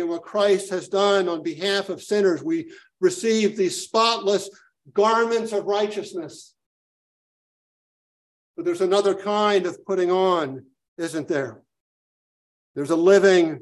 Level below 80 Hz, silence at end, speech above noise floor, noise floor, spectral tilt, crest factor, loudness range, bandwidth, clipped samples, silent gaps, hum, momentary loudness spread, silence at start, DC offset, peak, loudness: -72 dBFS; 0 s; over 69 dB; under -90 dBFS; -4 dB/octave; 18 dB; 6 LU; 12.5 kHz; under 0.1%; 6.66-8.54 s, 10.88-10.96 s, 11.80-12.74 s; none; 13 LU; 0 s; under 0.1%; -4 dBFS; -22 LUFS